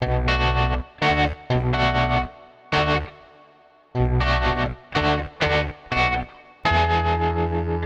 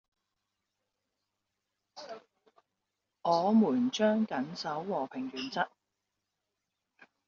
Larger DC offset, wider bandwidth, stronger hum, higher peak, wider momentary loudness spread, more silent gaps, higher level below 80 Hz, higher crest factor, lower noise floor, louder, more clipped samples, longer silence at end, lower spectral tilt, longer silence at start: neither; first, 8 kHz vs 7.2 kHz; neither; first, -10 dBFS vs -14 dBFS; second, 5 LU vs 21 LU; neither; first, -30 dBFS vs -80 dBFS; second, 12 dB vs 20 dB; second, -53 dBFS vs -86 dBFS; first, -22 LUFS vs -31 LUFS; neither; second, 0 s vs 1.6 s; first, -6.5 dB/octave vs -4.5 dB/octave; second, 0 s vs 1.95 s